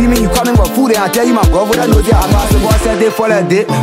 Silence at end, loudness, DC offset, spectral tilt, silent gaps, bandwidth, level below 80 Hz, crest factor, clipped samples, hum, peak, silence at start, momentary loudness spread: 0 s; -11 LUFS; under 0.1%; -5.5 dB/octave; none; 16.5 kHz; -18 dBFS; 10 dB; under 0.1%; none; 0 dBFS; 0 s; 2 LU